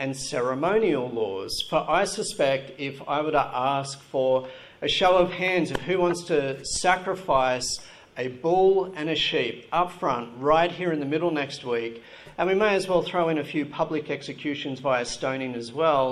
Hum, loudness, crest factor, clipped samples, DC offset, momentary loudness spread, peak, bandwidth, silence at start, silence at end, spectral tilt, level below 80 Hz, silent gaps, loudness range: none; -25 LUFS; 18 dB; under 0.1%; under 0.1%; 9 LU; -6 dBFS; 13 kHz; 0 s; 0 s; -4 dB/octave; -52 dBFS; none; 2 LU